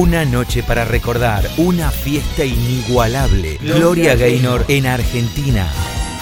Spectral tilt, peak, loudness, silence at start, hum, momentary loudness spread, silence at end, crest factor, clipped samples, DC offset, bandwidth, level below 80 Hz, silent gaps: -5.5 dB/octave; 0 dBFS; -15 LUFS; 0 s; none; 7 LU; 0 s; 14 dB; under 0.1%; under 0.1%; 16.5 kHz; -22 dBFS; none